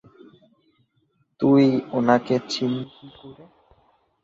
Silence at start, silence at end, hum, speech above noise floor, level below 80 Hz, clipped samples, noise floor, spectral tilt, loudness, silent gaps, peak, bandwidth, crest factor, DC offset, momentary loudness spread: 1.4 s; 0.9 s; none; 47 dB; -66 dBFS; under 0.1%; -68 dBFS; -6.5 dB/octave; -21 LUFS; none; -4 dBFS; 8 kHz; 20 dB; under 0.1%; 15 LU